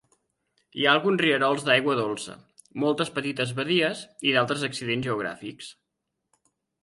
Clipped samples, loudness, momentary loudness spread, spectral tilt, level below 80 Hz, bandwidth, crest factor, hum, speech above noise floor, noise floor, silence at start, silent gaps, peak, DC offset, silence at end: under 0.1%; -25 LUFS; 18 LU; -4.5 dB/octave; -68 dBFS; 11.5 kHz; 22 dB; none; 56 dB; -82 dBFS; 0.75 s; none; -4 dBFS; under 0.1%; 1.1 s